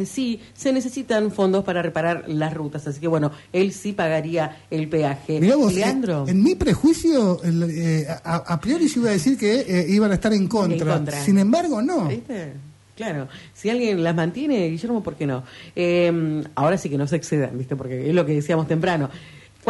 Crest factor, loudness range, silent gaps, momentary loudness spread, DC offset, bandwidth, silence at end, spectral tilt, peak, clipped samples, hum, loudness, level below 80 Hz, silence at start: 14 dB; 4 LU; none; 10 LU; under 0.1%; 11.5 kHz; 0 s; -6.5 dB/octave; -8 dBFS; under 0.1%; none; -21 LUFS; -48 dBFS; 0 s